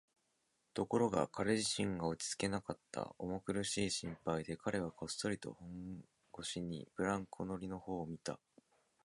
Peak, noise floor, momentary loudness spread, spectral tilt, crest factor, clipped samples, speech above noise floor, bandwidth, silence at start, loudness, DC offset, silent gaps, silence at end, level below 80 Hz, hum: -20 dBFS; -81 dBFS; 12 LU; -4.5 dB/octave; 22 dB; under 0.1%; 41 dB; 11.5 kHz; 0.75 s; -40 LUFS; under 0.1%; none; 0.7 s; -66 dBFS; none